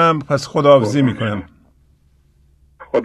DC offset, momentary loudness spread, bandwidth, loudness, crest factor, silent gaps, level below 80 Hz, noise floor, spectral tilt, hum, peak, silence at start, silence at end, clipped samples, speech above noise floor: under 0.1%; 11 LU; 12 kHz; -16 LUFS; 18 dB; none; -50 dBFS; -54 dBFS; -6.5 dB/octave; none; 0 dBFS; 0 s; 0 s; under 0.1%; 39 dB